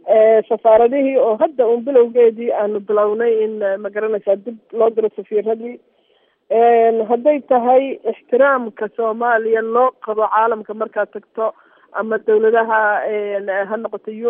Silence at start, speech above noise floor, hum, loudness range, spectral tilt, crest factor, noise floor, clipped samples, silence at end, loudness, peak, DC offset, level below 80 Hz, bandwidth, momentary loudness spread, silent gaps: 0.05 s; 43 dB; none; 4 LU; -3.5 dB/octave; 14 dB; -59 dBFS; under 0.1%; 0 s; -16 LUFS; -2 dBFS; under 0.1%; -66 dBFS; 3.7 kHz; 11 LU; none